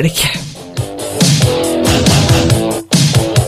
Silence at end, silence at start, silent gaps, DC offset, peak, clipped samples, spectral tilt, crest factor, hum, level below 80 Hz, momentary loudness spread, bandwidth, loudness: 0 s; 0 s; none; under 0.1%; 0 dBFS; under 0.1%; -4.5 dB/octave; 12 dB; none; -30 dBFS; 12 LU; 16 kHz; -12 LUFS